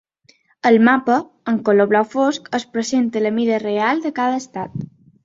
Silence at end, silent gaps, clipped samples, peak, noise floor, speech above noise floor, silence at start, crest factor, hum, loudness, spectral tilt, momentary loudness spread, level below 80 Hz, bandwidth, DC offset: 0.4 s; none; under 0.1%; -2 dBFS; -57 dBFS; 39 dB; 0.65 s; 16 dB; none; -18 LUFS; -5.5 dB/octave; 13 LU; -62 dBFS; 7.8 kHz; under 0.1%